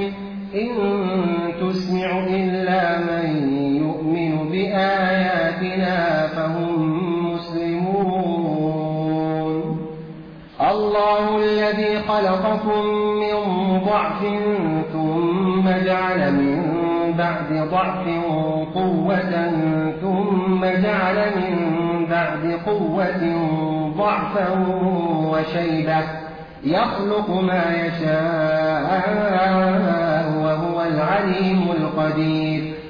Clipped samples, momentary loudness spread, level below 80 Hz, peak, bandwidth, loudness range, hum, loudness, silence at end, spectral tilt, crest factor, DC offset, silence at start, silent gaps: under 0.1%; 4 LU; -50 dBFS; -8 dBFS; 5.4 kHz; 2 LU; none; -20 LUFS; 0 s; -8.5 dB/octave; 12 dB; under 0.1%; 0 s; none